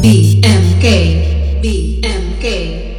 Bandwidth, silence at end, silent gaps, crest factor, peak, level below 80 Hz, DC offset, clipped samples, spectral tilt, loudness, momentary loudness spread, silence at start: 14 kHz; 0 s; none; 10 dB; 0 dBFS; -16 dBFS; under 0.1%; 0.2%; -6 dB/octave; -12 LUFS; 9 LU; 0 s